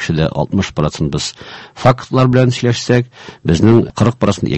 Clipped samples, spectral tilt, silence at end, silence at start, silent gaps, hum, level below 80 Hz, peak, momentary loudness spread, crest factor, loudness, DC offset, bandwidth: 0.3%; -6.5 dB/octave; 0 s; 0 s; none; none; -34 dBFS; 0 dBFS; 12 LU; 14 dB; -14 LUFS; under 0.1%; 8.4 kHz